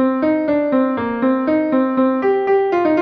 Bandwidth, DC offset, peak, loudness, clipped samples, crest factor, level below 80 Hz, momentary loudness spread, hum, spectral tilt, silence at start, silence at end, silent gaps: 5.2 kHz; under 0.1%; -4 dBFS; -17 LUFS; under 0.1%; 12 dB; -56 dBFS; 2 LU; none; -8 dB/octave; 0 s; 0 s; none